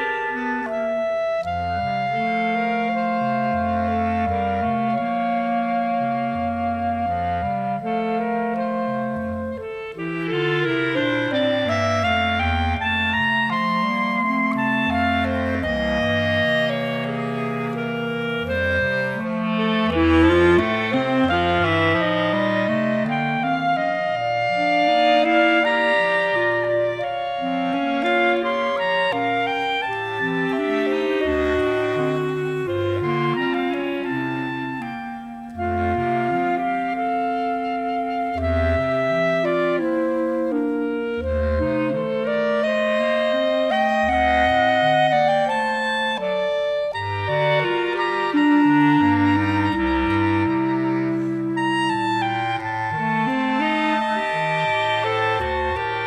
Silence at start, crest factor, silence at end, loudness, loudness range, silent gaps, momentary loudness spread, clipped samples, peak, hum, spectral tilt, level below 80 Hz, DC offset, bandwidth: 0 s; 18 dB; 0 s; -21 LUFS; 5 LU; none; 7 LU; under 0.1%; -4 dBFS; 50 Hz at -55 dBFS; -6.5 dB/octave; -42 dBFS; under 0.1%; 12 kHz